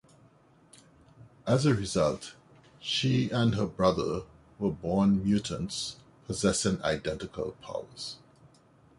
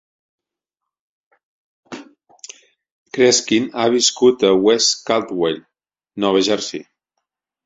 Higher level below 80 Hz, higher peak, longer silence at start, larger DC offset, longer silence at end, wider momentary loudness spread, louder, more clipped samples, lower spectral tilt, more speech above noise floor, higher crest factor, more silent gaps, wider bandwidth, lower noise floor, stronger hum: first, -52 dBFS vs -62 dBFS; second, -10 dBFS vs -2 dBFS; second, 1.2 s vs 1.9 s; neither; about the same, 0.85 s vs 0.85 s; second, 14 LU vs 23 LU; second, -30 LUFS vs -16 LUFS; neither; first, -5.5 dB/octave vs -2.5 dB/octave; second, 32 dB vs 68 dB; about the same, 22 dB vs 18 dB; second, none vs 2.92-3.06 s; first, 11.5 kHz vs 8 kHz; second, -60 dBFS vs -84 dBFS; neither